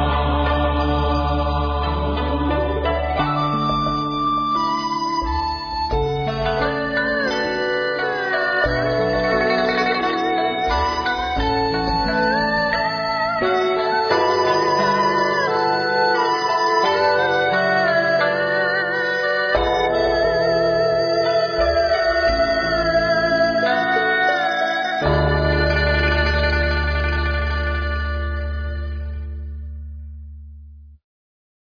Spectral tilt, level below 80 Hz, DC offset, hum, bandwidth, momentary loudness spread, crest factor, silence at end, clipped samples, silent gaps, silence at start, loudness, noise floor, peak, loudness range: -6 dB/octave; -28 dBFS; under 0.1%; none; 5.4 kHz; 5 LU; 14 dB; 0.8 s; under 0.1%; none; 0 s; -19 LUFS; -41 dBFS; -4 dBFS; 4 LU